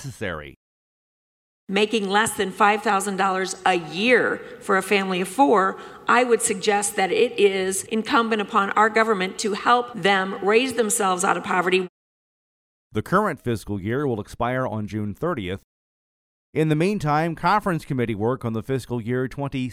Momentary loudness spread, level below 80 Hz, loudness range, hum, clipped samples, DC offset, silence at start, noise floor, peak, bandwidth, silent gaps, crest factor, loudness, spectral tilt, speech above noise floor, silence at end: 9 LU; -54 dBFS; 6 LU; none; under 0.1%; under 0.1%; 0 s; under -90 dBFS; -6 dBFS; 16 kHz; 0.56-1.67 s, 11.89-12.91 s, 15.64-16.53 s; 16 dB; -22 LUFS; -4 dB/octave; over 68 dB; 0 s